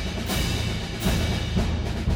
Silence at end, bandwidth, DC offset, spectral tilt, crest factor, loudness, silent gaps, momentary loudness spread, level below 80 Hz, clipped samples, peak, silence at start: 0 s; over 20 kHz; under 0.1%; -5 dB/octave; 14 dB; -26 LUFS; none; 2 LU; -30 dBFS; under 0.1%; -12 dBFS; 0 s